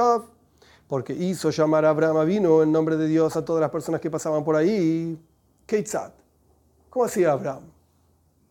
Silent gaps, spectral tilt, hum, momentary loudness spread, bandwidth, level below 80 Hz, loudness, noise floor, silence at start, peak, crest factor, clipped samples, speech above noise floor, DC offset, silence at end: none; -6.5 dB/octave; none; 12 LU; 17 kHz; -64 dBFS; -23 LUFS; -63 dBFS; 0 s; -8 dBFS; 16 dB; under 0.1%; 41 dB; under 0.1%; 0.85 s